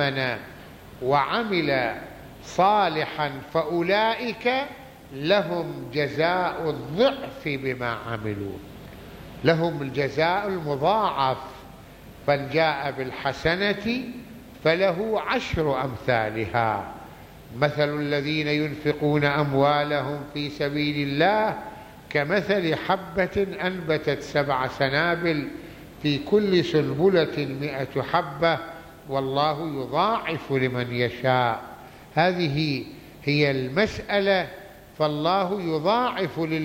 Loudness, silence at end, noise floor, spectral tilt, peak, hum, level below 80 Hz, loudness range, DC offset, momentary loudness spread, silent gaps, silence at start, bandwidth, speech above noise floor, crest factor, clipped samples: -24 LUFS; 0 s; -45 dBFS; -6.5 dB/octave; -6 dBFS; none; -52 dBFS; 2 LU; under 0.1%; 14 LU; none; 0 s; 16.5 kHz; 21 dB; 20 dB; under 0.1%